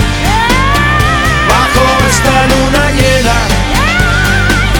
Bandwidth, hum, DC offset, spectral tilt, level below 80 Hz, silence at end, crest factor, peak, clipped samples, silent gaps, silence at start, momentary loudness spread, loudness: 19.5 kHz; none; under 0.1%; -4 dB/octave; -16 dBFS; 0 s; 8 dB; 0 dBFS; 0.4%; none; 0 s; 2 LU; -9 LUFS